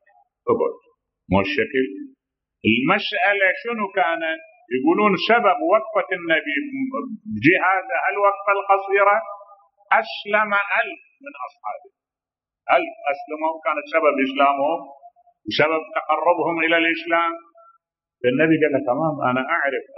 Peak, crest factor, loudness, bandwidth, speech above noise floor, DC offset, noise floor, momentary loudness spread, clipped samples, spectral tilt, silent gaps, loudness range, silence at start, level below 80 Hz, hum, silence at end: -2 dBFS; 20 dB; -20 LUFS; 6 kHz; 70 dB; under 0.1%; -90 dBFS; 13 LU; under 0.1%; -7.5 dB/octave; none; 4 LU; 0.45 s; -60 dBFS; none; 0 s